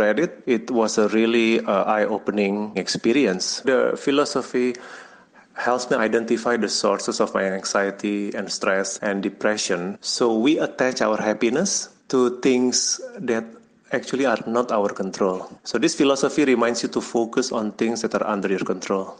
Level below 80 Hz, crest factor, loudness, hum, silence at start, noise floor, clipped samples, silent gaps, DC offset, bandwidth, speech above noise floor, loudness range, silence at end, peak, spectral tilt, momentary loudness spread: -66 dBFS; 16 dB; -22 LUFS; none; 0 s; -50 dBFS; under 0.1%; none; under 0.1%; 10 kHz; 28 dB; 2 LU; 0.05 s; -6 dBFS; -3.5 dB/octave; 7 LU